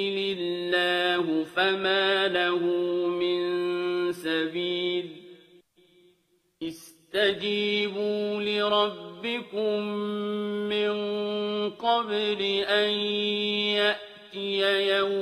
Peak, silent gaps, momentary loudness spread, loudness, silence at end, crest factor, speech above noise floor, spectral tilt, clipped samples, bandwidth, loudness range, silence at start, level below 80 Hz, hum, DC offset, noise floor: -10 dBFS; none; 8 LU; -26 LUFS; 0 s; 16 dB; 42 dB; -5 dB/octave; under 0.1%; 14 kHz; 6 LU; 0 s; -74 dBFS; none; under 0.1%; -69 dBFS